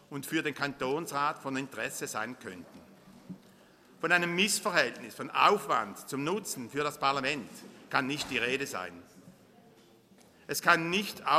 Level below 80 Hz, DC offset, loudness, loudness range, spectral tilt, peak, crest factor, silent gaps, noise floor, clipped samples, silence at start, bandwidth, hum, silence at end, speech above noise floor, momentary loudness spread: -72 dBFS; under 0.1%; -30 LUFS; 7 LU; -3 dB/octave; -8 dBFS; 26 dB; none; -60 dBFS; under 0.1%; 0.1 s; 15.5 kHz; none; 0 s; 29 dB; 18 LU